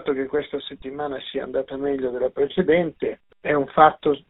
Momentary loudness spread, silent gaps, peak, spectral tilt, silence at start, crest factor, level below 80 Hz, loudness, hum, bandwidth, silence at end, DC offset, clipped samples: 14 LU; none; -2 dBFS; -4 dB/octave; 0 s; 22 dB; -54 dBFS; -23 LUFS; none; 4.1 kHz; 0.1 s; under 0.1%; under 0.1%